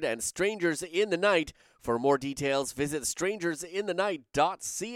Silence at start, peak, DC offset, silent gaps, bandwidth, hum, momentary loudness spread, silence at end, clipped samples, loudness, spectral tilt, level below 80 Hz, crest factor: 0 s; -12 dBFS; under 0.1%; none; 16.5 kHz; none; 7 LU; 0 s; under 0.1%; -29 LUFS; -3.5 dB/octave; -60 dBFS; 18 dB